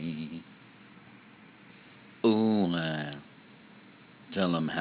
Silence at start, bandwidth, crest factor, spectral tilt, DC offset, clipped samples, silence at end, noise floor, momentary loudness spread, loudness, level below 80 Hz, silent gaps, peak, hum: 0 s; 4 kHz; 20 dB; -5 dB/octave; under 0.1%; under 0.1%; 0 s; -54 dBFS; 27 LU; -30 LUFS; -68 dBFS; none; -14 dBFS; none